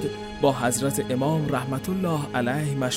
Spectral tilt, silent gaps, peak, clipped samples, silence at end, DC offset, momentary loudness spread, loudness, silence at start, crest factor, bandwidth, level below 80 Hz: -5 dB/octave; none; -8 dBFS; under 0.1%; 0 s; under 0.1%; 4 LU; -25 LUFS; 0 s; 18 dB; 16 kHz; -50 dBFS